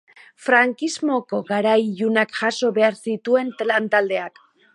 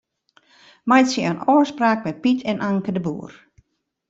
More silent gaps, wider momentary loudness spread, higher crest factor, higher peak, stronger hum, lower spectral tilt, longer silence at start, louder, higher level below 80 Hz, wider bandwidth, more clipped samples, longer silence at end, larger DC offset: neither; second, 8 LU vs 13 LU; about the same, 18 dB vs 18 dB; about the same, -2 dBFS vs -4 dBFS; neither; about the same, -4.5 dB/octave vs -5.5 dB/octave; second, 0.4 s vs 0.85 s; about the same, -20 LUFS vs -20 LUFS; second, -74 dBFS vs -62 dBFS; first, 11 kHz vs 8 kHz; neither; second, 0.45 s vs 0.75 s; neither